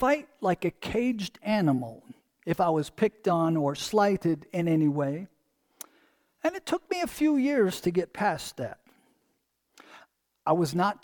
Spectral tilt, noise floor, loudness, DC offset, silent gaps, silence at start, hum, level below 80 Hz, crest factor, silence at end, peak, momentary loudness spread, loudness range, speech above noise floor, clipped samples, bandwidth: -6 dB/octave; -75 dBFS; -28 LUFS; under 0.1%; none; 0 s; none; -60 dBFS; 18 dB; 0.1 s; -10 dBFS; 13 LU; 4 LU; 49 dB; under 0.1%; 19 kHz